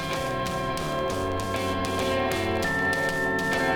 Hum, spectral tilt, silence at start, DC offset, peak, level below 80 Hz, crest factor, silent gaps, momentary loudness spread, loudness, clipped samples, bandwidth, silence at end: none; -4.5 dB/octave; 0 s; under 0.1%; -10 dBFS; -46 dBFS; 16 dB; none; 4 LU; -26 LUFS; under 0.1%; 19.5 kHz; 0 s